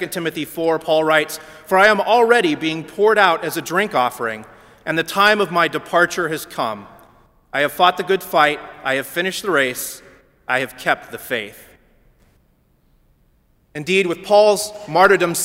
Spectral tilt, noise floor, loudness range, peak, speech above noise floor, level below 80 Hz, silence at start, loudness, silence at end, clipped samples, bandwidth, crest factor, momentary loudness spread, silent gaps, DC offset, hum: -3.5 dB/octave; -58 dBFS; 10 LU; 0 dBFS; 41 dB; -58 dBFS; 0 s; -17 LUFS; 0 s; under 0.1%; 16.5 kHz; 18 dB; 13 LU; none; under 0.1%; none